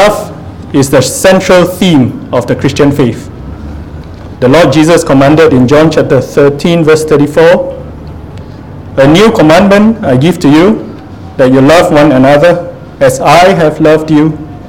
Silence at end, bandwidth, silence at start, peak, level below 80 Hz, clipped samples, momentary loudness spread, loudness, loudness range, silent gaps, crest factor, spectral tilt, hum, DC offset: 0 s; 18 kHz; 0 s; 0 dBFS; -30 dBFS; 5%; 20 LU; -6 LUFS; 3 LU; none; 6 dB; -6 dB/octave; none; 1%